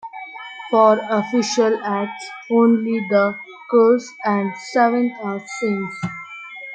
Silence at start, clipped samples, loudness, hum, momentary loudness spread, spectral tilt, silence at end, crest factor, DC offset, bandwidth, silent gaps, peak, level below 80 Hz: 0.05 s; under 0.1%; -19 LUFS; none; 18 LU; -5.5 dB/octave; 0 s; 18 dB; under 0.1%; 9 kHz; none; -2 dBFS; -70 dBFS